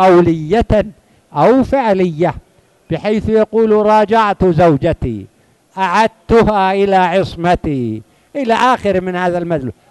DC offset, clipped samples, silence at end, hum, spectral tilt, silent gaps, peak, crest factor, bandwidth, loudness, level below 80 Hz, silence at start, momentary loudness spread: under 0.1%; under 0.1%; 0.2 s; none; -7 dB/octave; none; 0 dBFS; 14 dB; 12 kHz; -13 LUFS; -34 dBFS; 0 s; 12 LU